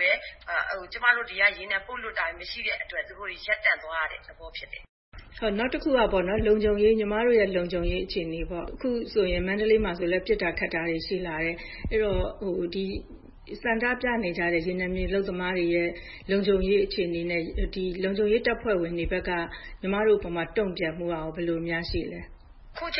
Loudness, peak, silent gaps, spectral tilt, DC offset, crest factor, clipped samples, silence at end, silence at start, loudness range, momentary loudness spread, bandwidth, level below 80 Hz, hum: -27 LUFS; -6 dBFS; 4.89-5.12 s; -9.5 dB/octave; under 0.1%; 20 dB; under 0.1%; 0 s; 0 s; 4 LU; 10 LU; 5.8 kHz; -40 dBFS; none